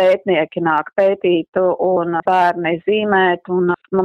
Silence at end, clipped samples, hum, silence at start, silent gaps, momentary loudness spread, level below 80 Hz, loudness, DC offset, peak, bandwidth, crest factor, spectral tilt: 0 s; under 0.1%; none; 0 s; 1.48-1.53 s; 3 LU; -60 dBFS; -16 LUFS; under 0.1%; -2 dBFS; 6.2 kHz; 14 dB; -7.5 dB/octave